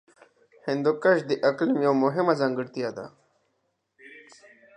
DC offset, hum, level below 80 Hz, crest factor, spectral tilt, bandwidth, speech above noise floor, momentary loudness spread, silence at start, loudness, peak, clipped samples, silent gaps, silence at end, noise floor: under 0.1%; none; -78 dBFS; 20 dB; -7 dB/octave; 9.6 kHz; 51 dB; 12 LU; 0.65 s; -24 LUFS; -6 dBFS; under 0.1%; none; 0.55 s; -75 dBFS